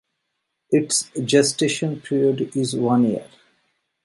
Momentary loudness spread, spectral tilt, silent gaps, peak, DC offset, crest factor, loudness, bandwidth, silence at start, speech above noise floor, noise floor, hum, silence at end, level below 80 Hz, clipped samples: 6 LU; -4.5 dB/octave; none; -4 dBFS; under 0.1%; 18 dB; -20 LUFS; 11.5 kHz; 0.7 s; 57 dB; -77 dBFS; none; 0.8 s; -66 dBFS; under 0.1%